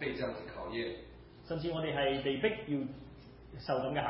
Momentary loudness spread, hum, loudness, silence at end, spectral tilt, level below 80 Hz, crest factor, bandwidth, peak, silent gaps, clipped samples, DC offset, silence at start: 20 LU; none; -36 LUFS; 0 s; -4 dB/octave; -58 dBFS; 18 dB; 5.6 kHz; -18 dBFS; none; under 0.1%; under 0.1%; 0 s